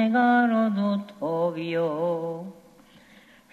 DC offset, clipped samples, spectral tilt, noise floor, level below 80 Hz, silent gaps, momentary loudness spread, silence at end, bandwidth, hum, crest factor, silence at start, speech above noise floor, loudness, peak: under 0.1%; under 0.1%; -8 dB/octave; -54 dBFS; -74 dBFS; none; 13 LU; 1 s; 7.2 kHz; none; 14 dB; 0 s; 30 dB; -25 LUFS; -12 dBFS